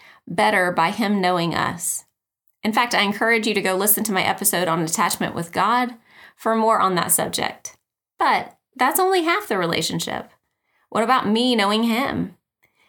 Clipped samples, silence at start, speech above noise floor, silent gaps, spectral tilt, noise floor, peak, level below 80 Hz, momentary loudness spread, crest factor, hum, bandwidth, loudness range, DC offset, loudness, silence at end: under 0.1%; 0.25 s; 49 dB; none; -3 dB/octave; -69 dBFS; -4 dBFS; -64 dBFS; 10 LU; 18 dB; none; 19.5 kHz; 2 LU; under 0.1%; -20 LUFS; 0.6 s